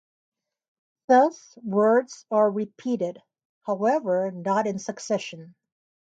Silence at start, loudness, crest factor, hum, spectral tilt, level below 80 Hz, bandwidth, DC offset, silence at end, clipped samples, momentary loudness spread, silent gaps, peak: 1.1 s; -24 LUFS; 18 dB; none; -5.5 dB/octave; -78 dBFS; 9 kHz; under 0.1%; 0.7 s; under 0.1%; 13 LU; 3.45-3.61 s; -8 dBFS